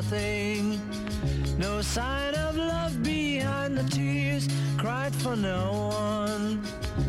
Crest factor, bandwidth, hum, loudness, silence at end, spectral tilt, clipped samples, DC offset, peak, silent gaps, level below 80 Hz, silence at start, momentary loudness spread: 8 dB; 15.5 kHz; none; -29 LUFS; 0 s; -5.5 dB/octave; under 0.1%; under 0.1%; -20 dBFS; none; -40 dBFS; 0 s; 3 LU